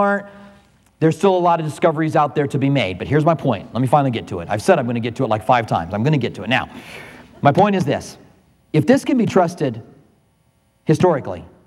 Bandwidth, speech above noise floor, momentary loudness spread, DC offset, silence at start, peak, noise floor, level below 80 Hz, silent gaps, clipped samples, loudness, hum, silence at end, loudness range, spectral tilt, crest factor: 13 kHz; 43 dB; 9 LU; under 0.1%; 0 s; 0 dBFS; -60 dBFS; -54 dBFS; none; under 0.1%; -18 LUFS; none; 0.2 s; 2 LU; -7 dB/octave; 18 dB